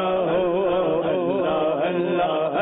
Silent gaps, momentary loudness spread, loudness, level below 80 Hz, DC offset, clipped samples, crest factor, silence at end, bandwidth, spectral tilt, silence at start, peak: none; 1 LU; -22 LUFS; -54 dBFS; under 0.1%; under 0.1%; 8 dB; 0 s; 4 kHz; -11 dB/octave; 0 s; -12 dBFS